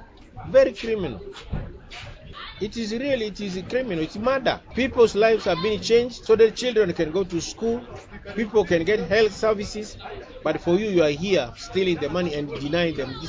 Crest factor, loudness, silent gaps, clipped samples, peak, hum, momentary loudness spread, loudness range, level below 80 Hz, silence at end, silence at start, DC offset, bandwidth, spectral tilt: 18 dB; -23 LUFS; none; under 0.1%; -6 dBFS; none; 17 LU; 6 LU; -44 dBFS; 0 s; 0 s; under 0.1%; 7.8 kHz; -5 dB/octave